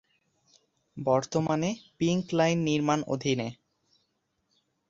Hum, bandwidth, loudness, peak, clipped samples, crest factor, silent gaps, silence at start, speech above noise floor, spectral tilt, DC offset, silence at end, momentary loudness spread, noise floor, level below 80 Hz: none; 7.8 kHz; -28 LUFS; -10 dBFS; under 0.1%; 18 dB; none; 0.95 s; 49 dB; -5.5 dB/octave; under 0.1%; 1.35 s; 8 LU; -76 dBFS; -64 dBFS